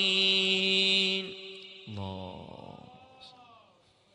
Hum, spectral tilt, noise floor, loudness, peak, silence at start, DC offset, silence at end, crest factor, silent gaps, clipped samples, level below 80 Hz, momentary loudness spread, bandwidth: none; -3 dB/octave; -64 dBFS; -25 LUFS; -12 dBFS; 0 s; under 0.1%; 0.7 s; 18 dB; none; under 0.1%; -72 dBFS; 23 LU; 10.5 kHz